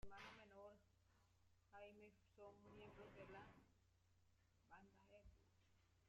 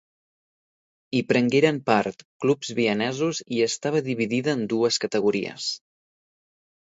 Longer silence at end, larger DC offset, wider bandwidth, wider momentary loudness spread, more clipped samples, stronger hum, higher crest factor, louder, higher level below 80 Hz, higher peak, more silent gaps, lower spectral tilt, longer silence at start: second, 0 s vs 1.05 s; neither; about the same, 7.6 kHz vs 8 kHz; about the same, 8 LU vs 8 LU; neither; neither; about the same, 20 dB vs 22 dB; second, -65 LUFS vs -24 LUFS; second, -78 dBFS vs -68 dBFS; second, -46 dBFS vs -4 dBFS; second, none vs 2.25-2.40 s; about the same, -4 dB/octave vs -4.5 dB/octave; second, 0 s vs 1.1 s